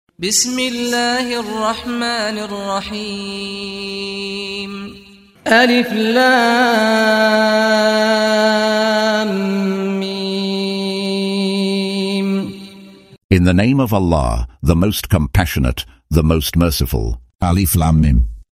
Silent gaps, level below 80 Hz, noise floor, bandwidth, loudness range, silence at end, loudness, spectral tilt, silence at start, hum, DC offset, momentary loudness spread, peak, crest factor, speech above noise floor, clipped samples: 13.24-13.29 s, 17.35-17.39 s; -28 dBFS; -39 dBFS; 16 kHz; 7 LU; 0.1 s; -16 LUFS; -4.5 dB/octave; 0.2 s; none; under 0.1%; 11 LU; 0 dBFS; 16 dB; 24 dB; under 0.1%